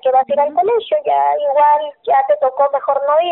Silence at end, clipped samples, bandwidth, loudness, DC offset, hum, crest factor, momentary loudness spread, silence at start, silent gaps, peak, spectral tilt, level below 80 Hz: 0 s; under 0.1%; 4.1 kHz; -15 LUFS; under 0.1%; none; 10 dB; 4 LU; 0.05 s; none; -4 dBFS; 0 dB/octave; -68 dBFS